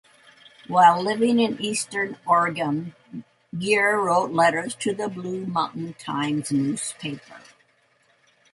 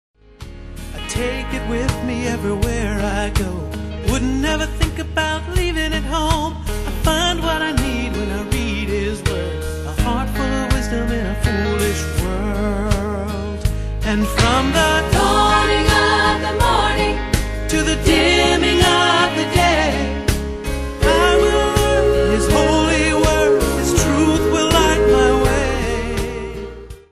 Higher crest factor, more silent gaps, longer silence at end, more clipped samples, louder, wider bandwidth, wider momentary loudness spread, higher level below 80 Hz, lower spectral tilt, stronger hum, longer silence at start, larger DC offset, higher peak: about the same, 20 dB vs 18 dB; neither; first, 1.15 s vs 0.15 s; neither; second, -23 LUFS vs -17 LUFS; second, 11.5 kHz vs 14 kHz; first, 16 LU vs 10 LU; second, -68 dBFS vs -24 dBFS; about the same, -4.5 dB/octave vs -4.5 dB/octave; neither; first, 0.7 s vs 0.4 s; neither; second, -4 dBFS vs 0 dBFS